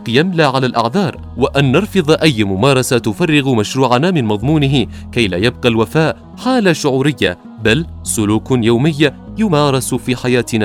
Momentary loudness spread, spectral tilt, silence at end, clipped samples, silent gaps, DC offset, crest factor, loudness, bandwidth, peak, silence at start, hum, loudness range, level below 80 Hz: 6 LU; -5.5 dB/octave; 0 s; under 0.1%; none; under 0.1%; 14 dB; -14 LUFS; 16 kHz; 0 dBFS; 0 s; none; 2 LU; -38 dBFS